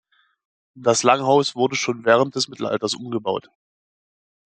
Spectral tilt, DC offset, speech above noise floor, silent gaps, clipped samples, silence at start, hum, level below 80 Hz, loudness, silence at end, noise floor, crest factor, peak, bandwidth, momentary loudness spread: -3.5 dB/octave; under 0.1%; over 70 dB; none; under 0.1%; 0.75 s; none; -68 dBFS; -20 LUFS; 1.05 s; under -90 dBFS; 22 dB; 0 dBFS; 9.4 kHz; 9 LU